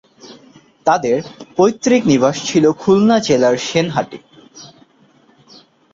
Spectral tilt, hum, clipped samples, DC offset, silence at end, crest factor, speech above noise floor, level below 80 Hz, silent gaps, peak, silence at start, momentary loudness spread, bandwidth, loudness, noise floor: -5 dB/octave; none; under 0.1%; under 0.1%; 1.3 s; 16 dB; 38 dB; -54 dBFS; none; -2 dBFS; 0.25 s; 9 LU; 7.8 kHz; -15 LUFS; -52 dBFS